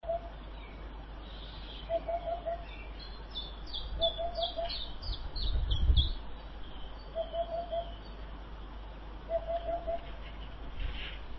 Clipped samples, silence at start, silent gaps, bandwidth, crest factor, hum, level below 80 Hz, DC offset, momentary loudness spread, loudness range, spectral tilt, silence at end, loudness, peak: under 0.1%; 0.05 s; none; 6 kHz; 22 dB; none; -40 dBFS; under 0.1%; 15 LU; 6 LU; -3.5 dB/octave; 0 s; -38 LUFS; -14 dBFS